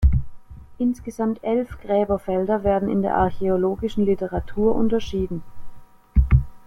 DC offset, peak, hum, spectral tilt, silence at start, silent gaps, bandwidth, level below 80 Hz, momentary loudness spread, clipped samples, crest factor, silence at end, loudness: under 0.1%; -4 dBFS; none; -9 dB/octave; 0 s; none; 10.5 kHz; -28 dBFS; 7 LU; under 0.1%; 18 dB; 0.1 s; -23 LUFS